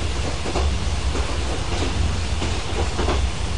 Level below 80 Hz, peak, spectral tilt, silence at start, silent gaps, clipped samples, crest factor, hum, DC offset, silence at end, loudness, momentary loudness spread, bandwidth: -26 dBFS; -8 dBFS; -4.5 dB/octave; 0 s; none; under 0.1%; 14 dB; none; 4%; 0 s; -24 LUFS; 3 LU; 10.5 kHz